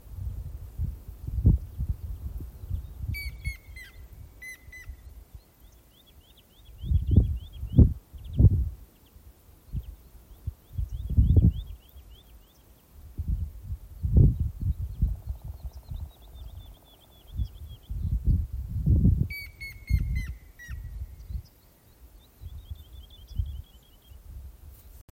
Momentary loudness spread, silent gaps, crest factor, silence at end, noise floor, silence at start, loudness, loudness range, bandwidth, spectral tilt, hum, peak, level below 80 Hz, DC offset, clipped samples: 24 LU; none; 24 dB; 0.15 s; -57 dBFS; 0.05 s; -29 LUFS; 16 LU; 16.5 kHz; -8.5 dB/octave; none; -4 dBFS; -32 dBFS; under 0.1%; under 0.1%